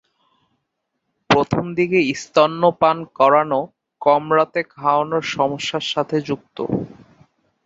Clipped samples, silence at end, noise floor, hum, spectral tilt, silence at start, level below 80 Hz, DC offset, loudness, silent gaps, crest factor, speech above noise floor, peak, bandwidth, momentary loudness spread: under 0.1%; 0.75 s; -75 dBFS; none; -5.5 dB/octave; 1.3 s; -56 dBFS; under 0.1%; -19 LUFS; none; 18 dB; 57 dB; -2 dBFS; 8 kHz; 9 LU